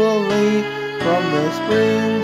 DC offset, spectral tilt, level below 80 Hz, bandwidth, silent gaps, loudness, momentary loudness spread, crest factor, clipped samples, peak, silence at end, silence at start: under 0.1%; -5.5 dB/octave; -54 dBFS; 14.5 kHz; none; -18 LUFS; 4 LU; 12 dB; under 0.1%; -6 dBFS; 0 s; 0 s